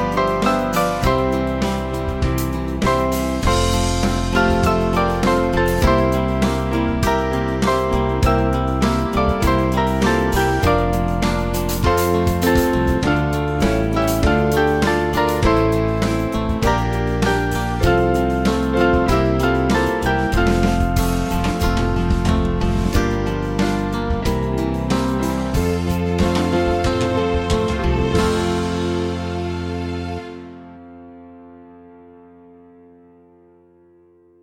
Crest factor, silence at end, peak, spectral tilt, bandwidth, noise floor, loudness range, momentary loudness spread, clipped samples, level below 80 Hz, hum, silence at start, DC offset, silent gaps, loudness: 16 dB; 2.55 s; -2 dBFS; -6 dB/octave; 17 kHz; -52 dBFS; 3 LU; 5 LU; under 0.1%; -26 dBFS; none; 0 s; under 0.1%; none; -19 LUFS